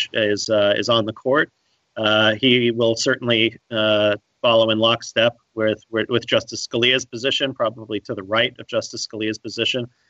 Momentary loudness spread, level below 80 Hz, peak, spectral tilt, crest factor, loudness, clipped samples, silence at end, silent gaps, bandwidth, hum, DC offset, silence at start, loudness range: 9 LU; -64 dBFS; -4 dBFS; -4 dB/octave; 16 dB; -19 LUFS; under 0.1%; 0.25 s; none; 8.2 kHz; none; under 0.1%; 0 s; 4 LU